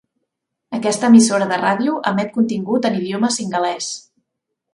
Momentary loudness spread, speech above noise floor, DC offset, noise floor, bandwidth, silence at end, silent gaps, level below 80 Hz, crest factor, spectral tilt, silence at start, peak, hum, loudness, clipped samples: 13 LU; 61 dB; under 0.1%; -77 dBFS; 11.5 kHz; 0.75 s; none; -66 dBFS; 18 dB; -4.5 dB/octave; 0.7 s; 0 dBFS; none; -17 LUFS; under 0.1%